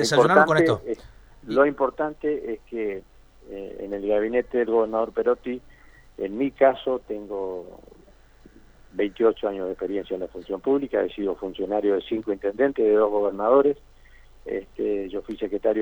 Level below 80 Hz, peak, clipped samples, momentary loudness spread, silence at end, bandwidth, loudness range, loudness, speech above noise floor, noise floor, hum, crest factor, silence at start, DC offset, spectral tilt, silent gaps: -52 dBFS; -2 dBFS; under 0.1%; 14 LU; 0 s; 19.5 kHz; 5 LU; -24 LUFS; 29 dB; -52 dBFS; none; 22 dB; 0 s; under 0.1%; -5.5 dB/octave; none